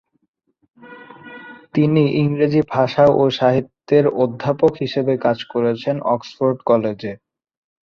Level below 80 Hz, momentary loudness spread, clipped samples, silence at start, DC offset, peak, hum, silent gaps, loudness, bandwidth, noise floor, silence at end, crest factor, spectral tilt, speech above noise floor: -56 dBFS; 15 LU; under 0.1%; 0.85 s; under 0.1%; -2 dBFS; none; none; -18 LUFS; 7 kHz; -40 dBFS; 0.65 s; 16 dB; -8 dB/octave; 24 dB